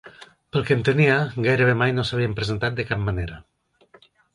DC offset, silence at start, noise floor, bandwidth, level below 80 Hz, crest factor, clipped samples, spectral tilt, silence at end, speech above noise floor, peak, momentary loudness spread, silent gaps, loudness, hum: under 0.1%; 0.05 s; -56 dBFS; 11.5 kHz; -44 dBFS; 18 dB; under 0.1%; -7 dB/octave; 0.95 s; 35 dB; -6 dBFS; 9 LU; none; -22 LUFS; none